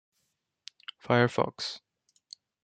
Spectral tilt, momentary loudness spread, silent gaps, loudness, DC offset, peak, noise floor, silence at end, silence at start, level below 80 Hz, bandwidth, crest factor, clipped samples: -5.5 dB/octave; 25 LU; none; -28 LUFS; under 0.1%; -8 dBFS; -79 dBFS; 0.85 s; 1.05 s; -72 dBFS; 9.2 kHz; 24 dB; under 0.1%